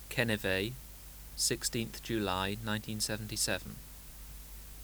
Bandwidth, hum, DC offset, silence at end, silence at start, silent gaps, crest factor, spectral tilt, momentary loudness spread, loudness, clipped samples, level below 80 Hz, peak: over 20 kHz; none; under 0.1%; 0 s; 0 s; none; 22 dB; -3 dB/octave; 17 LU; -34 LUFS; under 0.1%; -50 dBFS; -14 dBFS